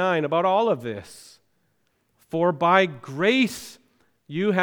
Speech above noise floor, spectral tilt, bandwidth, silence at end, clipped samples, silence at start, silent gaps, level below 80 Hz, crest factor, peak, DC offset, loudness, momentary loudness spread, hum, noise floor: 48 dB; -5.5 dB/octave; 19.5 kHz; 0 s; under 0.1%; 0 s; none; -68 dBFS; 20 dB; -4 dBFS; under 0.1%; -22 LUFS; 18 LU; none; -70 dBFS